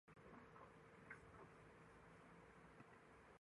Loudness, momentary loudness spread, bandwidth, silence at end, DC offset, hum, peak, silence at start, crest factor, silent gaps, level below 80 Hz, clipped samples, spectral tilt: -65 LUFS; 5 LU; 11 kHz; 0.05 s; under 0.1%; none; -44 dBFS; 0.05 s; 22 dB; none; -80 dBFS; under 0.1%; -6 dB/octave